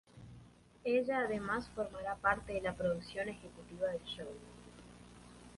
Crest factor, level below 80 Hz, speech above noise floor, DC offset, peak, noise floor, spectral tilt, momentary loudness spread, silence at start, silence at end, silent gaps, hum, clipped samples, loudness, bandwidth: 22 dB; -60 dBFS; 22 dB; under 0.1%; -16 dBFS; -60 dBFS; -5.5 dB/octave; 22 LU; 0.15 s; 0 s; none; 60 Hz at -55 dBFS; under 0.1%; -38 LUFS; 11.5 kHz